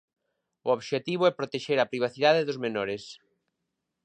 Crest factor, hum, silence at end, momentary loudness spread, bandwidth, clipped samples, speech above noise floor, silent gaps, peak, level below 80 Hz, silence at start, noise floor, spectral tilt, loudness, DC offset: 20 dB; none; 0.9 s; 11 LU; 9.6 kHz; under 0.1%; 56 dB; none; -8 dBFS; -74 dBFS; 0.65 s; -83 dBFS; -5 dB/octave; -27 LUFS; under 0.1%